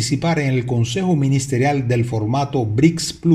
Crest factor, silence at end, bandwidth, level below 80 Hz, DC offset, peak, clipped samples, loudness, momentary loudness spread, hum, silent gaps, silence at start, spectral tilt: 16 dB; 0 s; 13.5 kHz; -46 dBFS; under 0.1%; -2 dBFS; under 0.1%; -18 LUFS; 4 LU; none; none; 0 s; -6 dB/octave